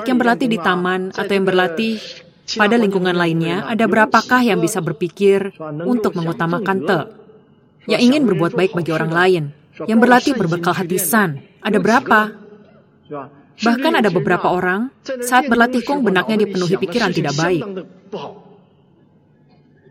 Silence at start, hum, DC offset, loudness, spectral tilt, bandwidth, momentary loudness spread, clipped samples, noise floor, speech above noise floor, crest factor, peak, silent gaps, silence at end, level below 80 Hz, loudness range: 0 s; none; under 0.1%; -16 LUFS; -5 dB/octave; 16 kHz; 14 LU; under 0.1%; -52 dBFS; 36 dB; 18 dB; 0 dBFS; none; 1.5 s; -60 dBFS; 4 LU